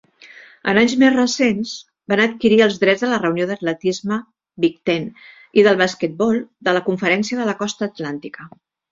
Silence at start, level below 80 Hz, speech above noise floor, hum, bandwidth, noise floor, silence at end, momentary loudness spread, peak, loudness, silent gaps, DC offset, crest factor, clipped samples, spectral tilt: 0.25 s; -60 dBFS; 26 dB; none; 7.8 kHz; -44 dBFS; 0.45 s; 12 LU; -2 dBFS; -18 LUFS; none; under 0.1%; 16 dB; under 0.1%; -4.5 dB/octave